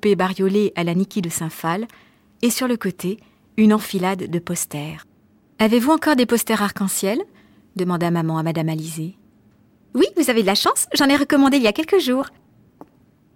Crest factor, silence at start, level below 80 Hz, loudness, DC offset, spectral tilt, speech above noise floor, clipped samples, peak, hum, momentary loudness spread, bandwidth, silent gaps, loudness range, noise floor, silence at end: 14 dB; 0.05 s; -58 dBFS; -19 LUFS; under 0.1%; -4.5 dB/octave; 37 dB; under 0.1%; -6 dBFS; none; 13 LU; 17 kHz; none; 5 LU; -56 dBFS; 1.05 s